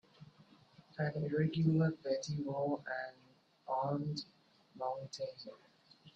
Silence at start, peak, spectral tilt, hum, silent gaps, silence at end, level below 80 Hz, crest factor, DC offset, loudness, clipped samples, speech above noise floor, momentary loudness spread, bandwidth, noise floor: 0.2 s; -20 dBFS; -7 dB/octave; none; none; 0.05 s; -74 dBFS; 18 dB; under 0.1%; -38 LUFS; under 0.1%; 27 dB; 19 LU; 8 kHz; -64 dBFS